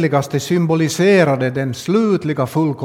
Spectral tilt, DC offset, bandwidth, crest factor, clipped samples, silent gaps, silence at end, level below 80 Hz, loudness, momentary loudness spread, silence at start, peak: -6 dB/octave; under 0.1%; 16.5 kHz; 16 dB; under 0.1%; none; 0 s; -58 dBFS; -16 LUFS; 6 LU; 0 s; 0 dBFS